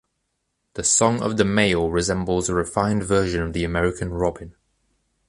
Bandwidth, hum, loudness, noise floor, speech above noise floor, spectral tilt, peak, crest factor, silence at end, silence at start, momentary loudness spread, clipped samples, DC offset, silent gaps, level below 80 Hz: 11.5 kHz; none; -21 LUFS; -75 dBFS; 54 dB; -4 dB/octave; -4 dBFS; 20 dB; 0.75 s; 0.75 s; 7 LU; under 0.1%; under 0.1%; none; -40 dBFS